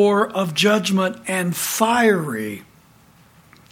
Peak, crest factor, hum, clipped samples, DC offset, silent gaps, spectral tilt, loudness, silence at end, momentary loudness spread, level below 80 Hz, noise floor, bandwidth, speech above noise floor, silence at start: -2 dBFS; 18 dB; none; under 0.1%; under 0.1%; none; -4 dB/octave; -19 LUFS; 1.1 s; 11 LU; -62 dBFS; -51 dBFS; 17.5 kHz; 33 dB; 0 s